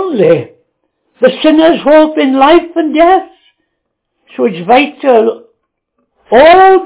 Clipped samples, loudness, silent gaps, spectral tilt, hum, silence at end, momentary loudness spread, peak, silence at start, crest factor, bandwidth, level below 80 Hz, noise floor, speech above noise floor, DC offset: 3%; -8 LUFS; none; -9 dB/octave; none; 0 s; 10 LU; 0 dBFS; 0 s; 10 dB; 4 kHz; -46 dBFS; -69 dBFS; 62 dB; under 0.1%